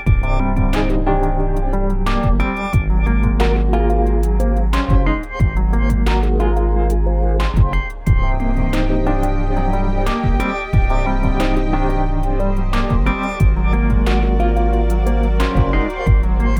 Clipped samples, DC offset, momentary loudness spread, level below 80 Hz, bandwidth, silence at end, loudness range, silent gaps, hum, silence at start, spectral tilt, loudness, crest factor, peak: under 0.1%; under 0.1%; 3 LU; -16 dBFS; 9.2 kHz; 0 s; 2 LU; none; none; 0 s; -7.5 dB/octave; -18 LUFS; 12 dB; -2 dBFS